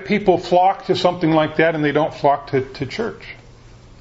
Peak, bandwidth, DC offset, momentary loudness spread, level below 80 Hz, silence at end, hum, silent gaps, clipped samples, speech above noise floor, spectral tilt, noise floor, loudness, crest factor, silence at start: 0 dBFS; 8 kHz; under 0.1%; 11 LU; -48 dBFS; 0.5 s; none; none; under 0.1%; 26 dB; -6.5 dB/octave; -43 dBFS; -18 LUFS; 18 dB; 0 s